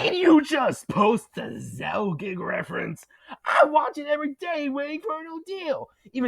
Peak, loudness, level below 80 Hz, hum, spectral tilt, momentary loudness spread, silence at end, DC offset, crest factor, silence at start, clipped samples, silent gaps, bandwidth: -4 dBFS; -25 LUFS; -66 dBFS; none; -5.5 dB/octave; 16 LU; 0 s; under 0.1%; 20 dB; 0 s; under 0.1%; none; 13.5 kHz